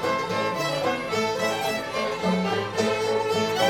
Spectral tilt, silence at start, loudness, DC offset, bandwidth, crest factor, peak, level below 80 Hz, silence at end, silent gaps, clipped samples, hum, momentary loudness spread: -4 dB/octave; 0 s; -25 LUFS; under 0.1%; 18 kHz; 16 dB; -10 dBFS; -58 dBFS; 0 s; none; under 0.1%; none; 2 LU